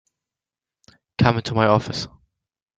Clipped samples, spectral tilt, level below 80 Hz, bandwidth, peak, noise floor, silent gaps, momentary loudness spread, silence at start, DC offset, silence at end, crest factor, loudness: under 0.1%; -6.5 dB/octave; -50 dBFS; 7.8 kHz; -2 dBFS; -90 dBFS; none; 16 LU; 1.2 s; under 0.1%; 0.7 s; 22 dB; -20 LUFS